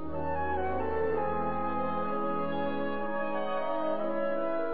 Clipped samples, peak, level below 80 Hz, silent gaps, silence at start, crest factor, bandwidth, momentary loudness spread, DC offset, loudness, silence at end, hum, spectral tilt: under 0.1%; -18 dBFS; -52 dBFS; none; 0 s; 12 dB; 4.8 kHz; 2 LU; 2%; -32 LUFS; 0 s; none; -10 dB/octave